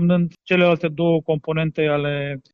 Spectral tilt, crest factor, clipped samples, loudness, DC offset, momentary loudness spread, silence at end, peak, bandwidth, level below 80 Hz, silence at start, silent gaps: -9 dB/octave; 16 dB; under 0.1%; -20 LUFS; under 0.1%; 6 LU; 0.15 s; -4 dBFS; 5.4 kHz; -54 dBFS; 0 s; none